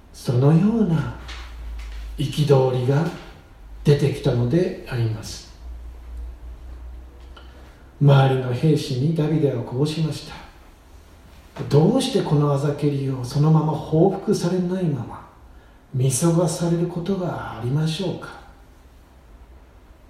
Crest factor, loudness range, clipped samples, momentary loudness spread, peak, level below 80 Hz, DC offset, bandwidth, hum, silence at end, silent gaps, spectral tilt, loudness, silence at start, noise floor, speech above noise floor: 18 dB; 5 LU; under 0.1%; 21 LU; -4 dBFS; -42 dBFS; under 0.1%; 13.5 kHz; none; 0.55 s; none; -7 dB/octave; -21 LUFS; 0.1 s; -48 dBFS; 28 dB